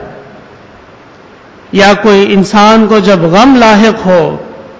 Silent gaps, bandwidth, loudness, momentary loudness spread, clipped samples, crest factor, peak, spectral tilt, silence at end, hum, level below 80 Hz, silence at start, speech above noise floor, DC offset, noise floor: none; 8 kHz; -6 LUFS; 6 LU; 0.9%; 8 dB; 0 dBFS; -5.5 dB/octave; 0.1 s; none; -38 dBFS; 0 s; 30 dB; under 0.1%; -35 dBFS